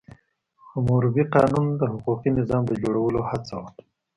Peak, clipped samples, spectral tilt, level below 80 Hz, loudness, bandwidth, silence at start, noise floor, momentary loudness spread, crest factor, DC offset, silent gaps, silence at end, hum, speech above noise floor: -6 dBFS; under 0.1%; -9 dB/octave; -50 dBFS; -23 LUFS; 10.5 kHz; 0.75 s; -60 dBFS; 14 LU; 18 dB; under 0.1%; none; 0.45 s; none; 38 dB